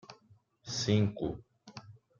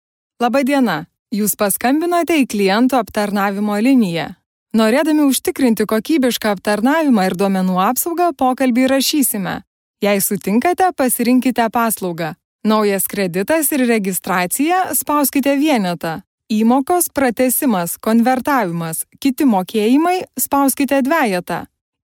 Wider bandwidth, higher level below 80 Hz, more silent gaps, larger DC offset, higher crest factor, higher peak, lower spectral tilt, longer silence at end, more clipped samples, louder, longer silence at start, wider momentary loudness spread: second, 7.6 kHz vs 18.5 kHz; second, -62 dBFS vs -56 dBFS; second, none vs 1.19-1.26 s, 4.46-4.66 s, 9.67-9.94 s, 12.45-12.59 s, 16.27-16.38 s; neither; first, 22 dB vs 14 dB; second, -14 dBFS vs -2 dBFS; first, -5.5 dB/octave vs -4 dB/octave; second, 0.25 s vs 0.4 s; neither; second, -32 LUFS vs -16 LUFS; second, 0.1 s vs 0.4 s; first, 23 LU vs 7 LU